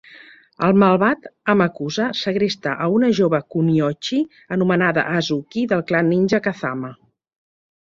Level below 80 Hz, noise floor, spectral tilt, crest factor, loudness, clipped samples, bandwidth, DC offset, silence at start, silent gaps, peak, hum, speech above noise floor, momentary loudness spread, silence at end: -58 dBFS; -45 dBFS; -6.5 dB/octave; 18 dB; -19 LUFS; under 0.1%; 7.6 kHz; under 0.1%; 0.1 s; none; -2 dBFS; none; 27 dB; 8 LU; 0.9 s